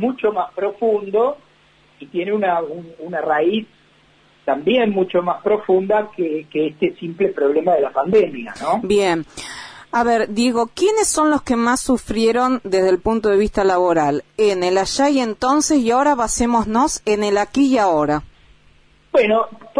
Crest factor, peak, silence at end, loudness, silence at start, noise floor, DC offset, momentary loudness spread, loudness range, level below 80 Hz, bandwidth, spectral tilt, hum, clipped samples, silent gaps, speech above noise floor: 12 dB; -6 dBFS; 0 s; -18 LUFS; 0 s; -53 dBFS; under 0.1%; 8 LU; 4 LU; -44 dBFS; 11 kHz; -4 dB/octave; none; under 0.1%; none; 36 dB